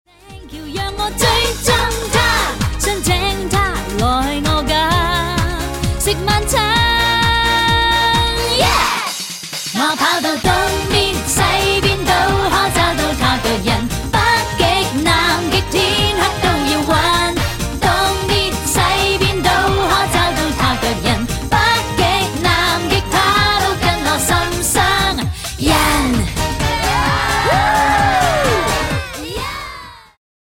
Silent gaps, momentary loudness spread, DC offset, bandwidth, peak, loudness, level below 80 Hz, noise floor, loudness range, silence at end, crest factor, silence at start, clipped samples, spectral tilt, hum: none; 6 LU; under 0.1%; 17 kHz; 0 dBFS; -15 LUFS; -26 dBFS; -36 dBFS; 2 LU; 0.4 s; 16 dB; 0.25 s; under 0.1%; -3.5 dB/octave; none